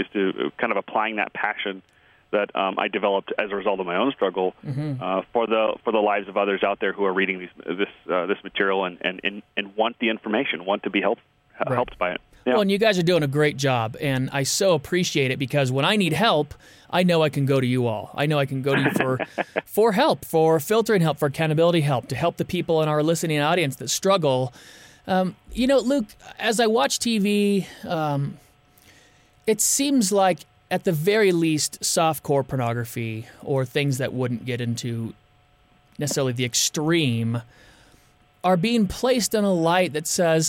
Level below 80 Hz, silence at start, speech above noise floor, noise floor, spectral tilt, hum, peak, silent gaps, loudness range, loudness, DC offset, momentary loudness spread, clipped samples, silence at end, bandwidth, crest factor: -56 dBFS; 0 s; 36 dB; -58 dBFS; -4.5 dB/octave; none; -6 dBFS; none; 4 LU; -23 LUFS; under 0.1%; 9 LU; under 0.1%; 0 s; 17 kHz; 16 dB